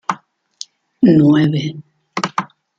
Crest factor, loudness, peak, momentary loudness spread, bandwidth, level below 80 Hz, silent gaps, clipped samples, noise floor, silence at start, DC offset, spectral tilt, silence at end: 16 dB; -15 LUFS; 0 dBFS; 23 LU; 7.6 kHz; -56 dBFS; none; under 0.1%; -38 dBFS; 0.1 s; under 0.1%; -7 dB/octave; 0.35 s